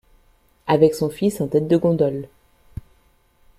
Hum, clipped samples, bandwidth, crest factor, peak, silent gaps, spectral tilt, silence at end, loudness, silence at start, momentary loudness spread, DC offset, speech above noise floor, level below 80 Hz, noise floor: none; under 0.1%; 15 kHz; 18 dB; -2 dBFS; none; -7.5 dB/octave; 1.3 s; -19 LUFS; 0.65 s; 23 LU; under 0.1%; 40 dB; -50 dBFS; -59 dBFS